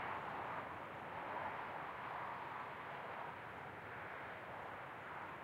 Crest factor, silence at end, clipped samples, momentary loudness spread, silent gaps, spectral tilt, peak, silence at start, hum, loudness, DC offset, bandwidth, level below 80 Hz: 14 dB; 0 s; under 0.1%; 5 LU; none; -5.5 dB/octave; -34 dBFS; 0 s; none; -48 LUFS; under 0.1%; 16 kHz; -78 dBFS